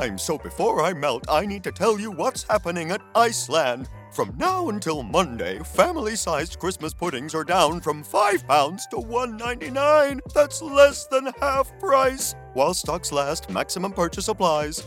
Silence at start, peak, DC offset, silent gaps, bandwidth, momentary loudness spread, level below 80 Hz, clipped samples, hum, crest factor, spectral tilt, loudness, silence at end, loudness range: 0 s; -2 dBFS; under 0.1%; none; 17 kHz; 9 LU; -46 dBFS; under 0.1%; none; 22 dB; -3.5 dB/octave; -23 LUFS; 0 s; 3 LU